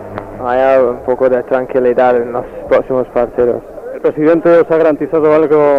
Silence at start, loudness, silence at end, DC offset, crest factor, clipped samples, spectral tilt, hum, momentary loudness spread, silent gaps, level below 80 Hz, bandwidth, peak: 0 s; -12 LUFS; 0 s; under 0.1%; 8 dB; under 0.1%; -8.5 dB/octave; none; 10 LU; none; -42 dBFS; 5.4 kHz; -2 dBFS